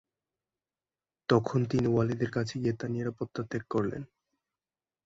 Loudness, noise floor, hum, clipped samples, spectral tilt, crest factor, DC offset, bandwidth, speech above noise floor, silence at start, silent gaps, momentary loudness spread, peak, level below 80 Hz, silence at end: -31 LUFS; under -90 dBFS; none; under 0.1%; -7.5 dB/octave; 22 dB; under 0.1%; 7.8 kHz; over 60 dB; 1.3 s; none; 10 LU; -10 dBFS; -60 dBFS; 1 s